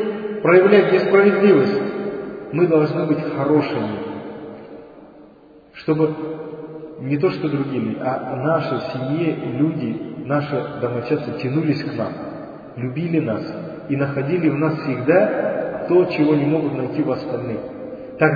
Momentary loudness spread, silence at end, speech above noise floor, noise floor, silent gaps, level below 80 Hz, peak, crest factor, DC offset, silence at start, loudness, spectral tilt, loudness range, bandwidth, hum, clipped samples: 17 LU; 0 s; 28 dB; -47 dBFS; none; -58 dBFS; 0 dBFS; 20 dB; under 0.1%; 0 s; -20 LUFS; -9.5 dB/octave; 7 LU; 5 kHz; none; under 0.1%